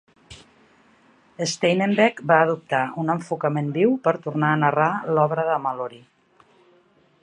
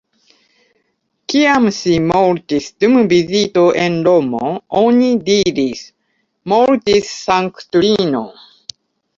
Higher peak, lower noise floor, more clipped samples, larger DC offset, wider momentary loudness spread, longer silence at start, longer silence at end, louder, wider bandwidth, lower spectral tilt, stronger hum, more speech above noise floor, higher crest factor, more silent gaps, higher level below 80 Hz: about the same, -2 dBFS vs -2 dBFS; second, -59 dBFS vs -66 dBFS; neither; neither; second, 8 LU vs 15 LU; second, 0.3 s vs 1.3 s; first, 1.25 s vs 0.85 s; second, -21 LUFS vs -14 LUFS; first, 10.5 kHz vs 7.6 kHz; about the same, -5.5 dB/octave vs -5 dB/octave; neither; second, 38 dB vs 53 dB; first, 20 dB vs 14 dB; neither; second, -66 dBFS vs -50 dBFS